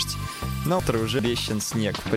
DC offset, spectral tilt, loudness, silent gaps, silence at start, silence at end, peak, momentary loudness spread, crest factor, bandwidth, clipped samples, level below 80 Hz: under 0.1%; -4.5 dB/octave; -26 LUFS; none; 0 s; 0 s; -8 dBFS; 6 LU; 18 dB; 16 kHz; under 0.1%; -40 dBFS